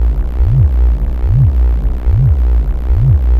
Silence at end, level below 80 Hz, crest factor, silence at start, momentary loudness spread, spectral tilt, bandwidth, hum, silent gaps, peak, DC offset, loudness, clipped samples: 0 s; -12 dBFS; 10 dB; 0 s; 5 LU; -10.5 dB/octave; 2.9 kHz; none; none; 0 dBFS; under 0.1%; -13 LUFS; under 0.1%